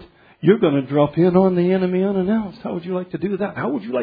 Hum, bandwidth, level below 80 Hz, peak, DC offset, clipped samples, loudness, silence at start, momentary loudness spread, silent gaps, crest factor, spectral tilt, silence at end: none; 4.9 kHz; -54 dBFS; -2 dBFS; under 0.1%; under 0.1%; -19 LUFS; 0 s; 10 LU; none; 18 dB; -11.5 dB/octave; 0 s